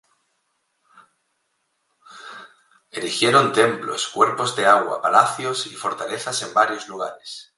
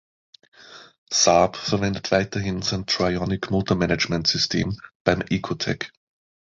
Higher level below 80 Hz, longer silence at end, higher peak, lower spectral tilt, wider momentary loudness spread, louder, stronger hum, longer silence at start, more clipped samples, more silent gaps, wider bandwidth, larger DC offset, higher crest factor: second, -72 dBFS vs -46 dBFS; second, 0.15 s vs 0.6 s; about the same, 0 dBFS vs -2 dBFS; about the same, -3 dB/octave vs -4 dB/octave; first, 20 LU vs 8 LU; about the same, -20 LUFS vs -22 LUFS; neither; first, 2.1 s vs 0.65 s; neither; second, none vs 0.98-1.07 s, 4.95-5.05 s; first, 11.5 kHz vs 7.8 kHz; neither; about the same, 22 dB vs 22 dB